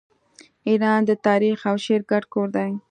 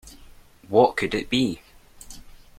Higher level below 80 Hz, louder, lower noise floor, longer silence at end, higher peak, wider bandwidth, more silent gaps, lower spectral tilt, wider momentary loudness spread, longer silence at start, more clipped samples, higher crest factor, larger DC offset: second, -72 dBFS vs -50 dBFS; about the same, -21 LUFS vs -22 LUFS; first, -53 dBFS vs -48 dBFS; second, 0.1 s vs 0.4 s; about the same, -4 dBFS vs -4 dBFS; second, 9.2 kHz vs 16 kHz; neither; first, -6.5 dB/octave vs -5 dB/octave; second, 6 LU vs 25 LU; first, 0.65 s vs 0.05 s; neither; second, 16 dB vs 22 dB; neither